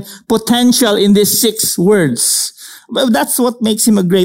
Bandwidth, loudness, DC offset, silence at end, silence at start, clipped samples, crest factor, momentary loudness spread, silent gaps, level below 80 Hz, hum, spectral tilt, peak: 16.5 kHz; -12 LUFS; under 0.1%; 0 s; 0 s; under 0.1%; 10 dB; 7 LU; none; -52 dBFS; none; -3.5 dB/octave; -2 dBFS